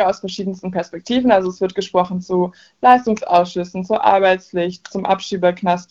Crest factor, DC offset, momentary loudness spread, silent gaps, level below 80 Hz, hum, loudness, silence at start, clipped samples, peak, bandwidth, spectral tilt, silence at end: 18 dB; under 0.1%; 11 LU; none; -54 dBFS; none; -18 LUFS; 0 s; under 0.1%; 0 dBFS; 7.8 kHz; -6 dB/octave; 0.1 s